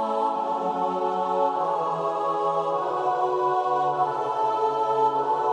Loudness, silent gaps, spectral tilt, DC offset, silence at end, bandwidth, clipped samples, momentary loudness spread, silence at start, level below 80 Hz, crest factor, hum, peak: -25 LUFS; none; -6 dB/octave; under 0.1%; 0 s; 9.8 kHz; under 0.1%; 3 LU; 0 s; -76 dBFS; 14 dB; none; -12 dBFS